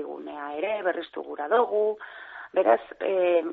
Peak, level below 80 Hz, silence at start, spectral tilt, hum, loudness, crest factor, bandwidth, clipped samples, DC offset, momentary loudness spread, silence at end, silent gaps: -8 dBFS; -74 dBFS; 0 s; -1.5 dB/octave; none; -26 LUFS; 18 dB; 4.4 kHz; under 0.1%; under 0.1%; 14 LU; 0 s; none